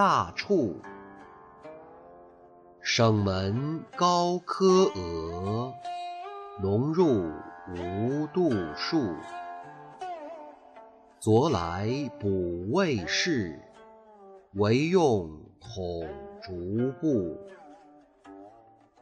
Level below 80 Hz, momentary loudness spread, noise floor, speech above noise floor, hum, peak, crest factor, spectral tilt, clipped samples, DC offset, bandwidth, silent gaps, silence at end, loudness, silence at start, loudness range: -58 dBFS; 21 LU; -57 dBFS; 30 dB; none; -10 dBFS; 18 dB; -6 dB/octave; under 0.1%; under 0.1%; 10 kHz; none; 0.5 s; -28 LUFS; 0 s; 5 LU